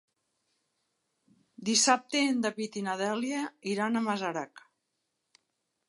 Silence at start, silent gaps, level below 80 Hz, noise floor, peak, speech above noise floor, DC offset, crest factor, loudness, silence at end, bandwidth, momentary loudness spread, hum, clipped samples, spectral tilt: 1.6 s; none; -82 dBFS; -82 dBFS; -10 dBFS; 52 dB; under 0.1%; 22 dB; -29 LUFS; 1.3 s; 11.5 kHz; 11 LU; none; under 0.1%; -2.5 dB/octave